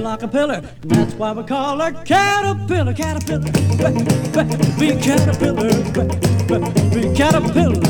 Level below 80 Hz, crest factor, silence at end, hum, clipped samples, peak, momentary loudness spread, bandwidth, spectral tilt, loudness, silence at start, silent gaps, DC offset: -36 dBFS; 16 dB; 0 s; none; under 0.1%; 0 dBFS; 6 LU; 18.5 kHz; -6 dB/octave; -17 LUFS; 0 s; none; under 0.1%